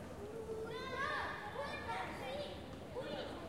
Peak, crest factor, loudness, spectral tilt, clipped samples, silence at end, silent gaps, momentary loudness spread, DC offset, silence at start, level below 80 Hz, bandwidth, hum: -28 dBFS; 16 dB; -44 LUFS; -5 dB/octave; under 0.1%; 0 s; none; 8 LU; under 0.1%; 0 s; -62 dBFS; 16 kHz; none